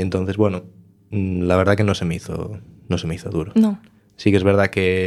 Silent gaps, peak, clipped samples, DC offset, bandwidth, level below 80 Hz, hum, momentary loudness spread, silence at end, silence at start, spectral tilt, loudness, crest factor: none; 0 dBFS; under 0.1%; under 0.1%; 12.5 kHz; -46 dBFS; none; 13 LU; 0 s; 0 s; -7 dB/octave; -20 LUFS; 20 dB